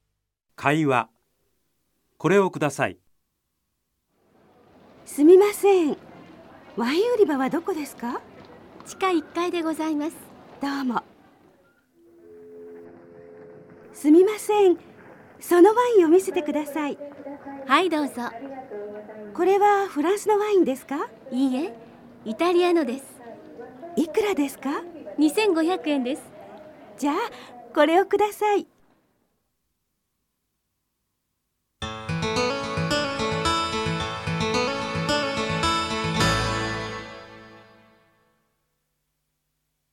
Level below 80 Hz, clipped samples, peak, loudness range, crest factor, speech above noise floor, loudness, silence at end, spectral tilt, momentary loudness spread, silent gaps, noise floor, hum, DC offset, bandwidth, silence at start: -52 dBFS; under 0.1%; -4 dBFS; 9 LU; 22 dB; 56 dB; -23 LUFS; 2.45 s; -5 dB/octave; 19 LU; none; -77 dBFS; none; under 0.1%; 16.5 kHz; 0.6 s